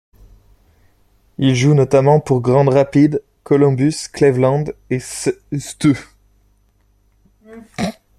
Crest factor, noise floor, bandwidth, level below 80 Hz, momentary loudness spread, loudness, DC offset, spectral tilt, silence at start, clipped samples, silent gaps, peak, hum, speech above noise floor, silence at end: 16 dB; -57 dBFS; 13 kHz; -48 dBFS; 12 LU; -16 LUFS; under 0.1%; -7 dB/octave; 1.4 s; under 0.1%; none; 0 dBFS; 50 Hz at -55 dBFS; 43 dB; 0.3 s